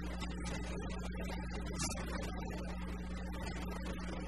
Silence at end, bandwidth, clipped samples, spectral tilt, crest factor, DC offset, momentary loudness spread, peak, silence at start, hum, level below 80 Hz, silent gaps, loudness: 0 s; 13 kHz; under 0.1%; -5 dB/octave; 16 dB; 0.2%; 4 LU; -24 dBFS; 0 s; none; -44 dBFS; none; -42 LUFS